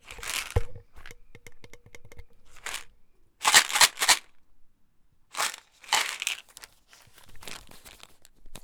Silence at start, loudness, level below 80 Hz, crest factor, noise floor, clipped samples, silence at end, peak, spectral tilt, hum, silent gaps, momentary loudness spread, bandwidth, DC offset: 0.05 s; -24 LUFS; -46 dBFS; 28 dB; -60 dBFS; under 0.1%; 0.05 s; -2 dBFS; 0.5 dB/octave; none; none; 24 LU; over 20 kHz; under 0.1%